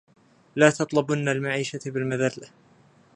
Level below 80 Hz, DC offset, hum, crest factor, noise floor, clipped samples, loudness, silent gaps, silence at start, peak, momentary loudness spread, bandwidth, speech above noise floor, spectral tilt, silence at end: -70 dBFS; under 0.1%; none; 24 dB; -57 dBFS; under 0.1%; -24 LUFS; none; 0.55 s; -2 dBFS; 10 LU; 10.5 kHz; 33 dB; -5.5 dB/octave; 0.7 s